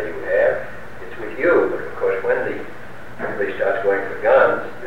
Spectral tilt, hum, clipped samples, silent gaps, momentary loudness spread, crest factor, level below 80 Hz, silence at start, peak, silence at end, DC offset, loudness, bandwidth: -6.5 dB/octave; none; under 0.1%; none; 19 LU; 16 dB; -52 dBFS; 0 s; -4 dBFS; 0 s; 3%; -19 LUFS; 9 kHz